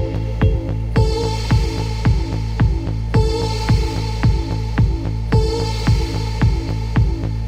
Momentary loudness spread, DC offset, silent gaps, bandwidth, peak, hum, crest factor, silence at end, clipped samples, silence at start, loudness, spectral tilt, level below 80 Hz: 4 LU; under 0.1%; none; 11 kHz; -4 dBFS; none; 14 dB; 0 s; under 0.1%; 0 s; -19 LUFS; -6.5 dB/octave; -22 dBFS